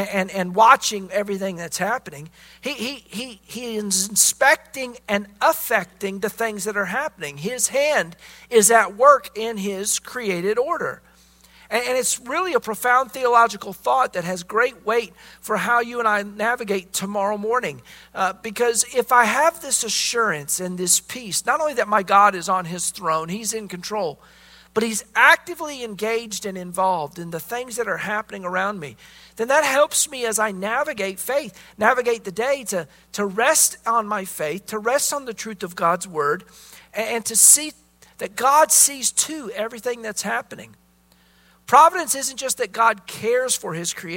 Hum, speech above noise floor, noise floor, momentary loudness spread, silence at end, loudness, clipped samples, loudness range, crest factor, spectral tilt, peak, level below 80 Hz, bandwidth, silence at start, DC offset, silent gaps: none; 36 dB; -57 dBFS; 15 LU; 0 s; -20 LUFS; under 0.1%; 5 LU; 22 dB; -1.5 dB/octave; 0 dBFS; -60 dBFS; 16.5 kHz; 0 s; under 0.1%; none